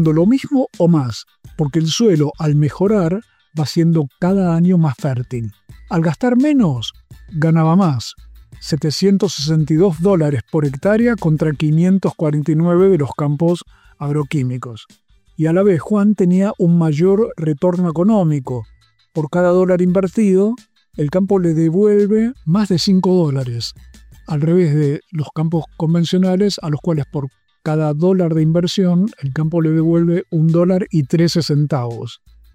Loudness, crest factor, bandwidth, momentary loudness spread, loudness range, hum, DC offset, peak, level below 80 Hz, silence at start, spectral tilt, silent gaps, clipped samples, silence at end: -16 LUFS; 12 dB; 10.5 kHz; 11 LU; 2 LU; none; under 0.1%; -4 dBFS; -46 dBFS; 0 s; -7.5 dB/octave; none; under 0.1%; 0.4 s